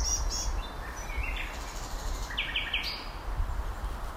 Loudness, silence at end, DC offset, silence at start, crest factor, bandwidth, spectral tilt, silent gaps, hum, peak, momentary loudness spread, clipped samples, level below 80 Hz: -34 LUFS; 0 s; under 0.1%; 0 s; 16 dB; 16 kHz; -2 dB/octave; none; none; -18 dBFS; 9 LU; under 0.1%; -36 dBFS